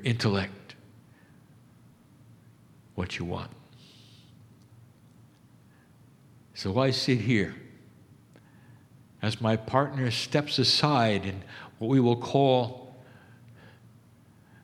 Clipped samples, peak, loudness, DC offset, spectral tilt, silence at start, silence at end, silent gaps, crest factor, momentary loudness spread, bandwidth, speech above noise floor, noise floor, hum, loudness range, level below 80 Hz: under 0.1%; -6 dBFS; -27 LUFS; under 0.1%; -5.5 dB/octave; 0 s; 0.95 s; none; 24 dB; 22 LU; 13.5 kHz; 31 dB; -57 dBFS; none; 15 LU; -64 dBFS